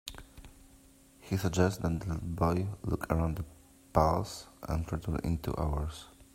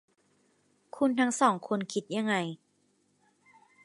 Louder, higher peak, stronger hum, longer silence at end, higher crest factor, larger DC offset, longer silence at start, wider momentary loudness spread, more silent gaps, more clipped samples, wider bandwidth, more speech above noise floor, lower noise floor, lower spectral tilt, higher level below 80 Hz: second, -33 LUFS vs -29 LUFS; about the same, -8 dBFS vs -10 dBFS; second, none vs 50 Hz at -55 dBFS; second, 0.1 s vs 1.3 s; about the same, 26 dB vs 24 dB; neither; second, 0.05 s vs 0.95 s; about the same, 13 LU vs 15 LU; neither; neither; first, 16 kHz vs 11.5 kHz; second, 28 dB vs 43 dB; second, -59 dBFS vs -71 dBFS; first, -6.5 dB/octave vs -4.5 dB/octave; first, -44 dBFS vs -82 dBFS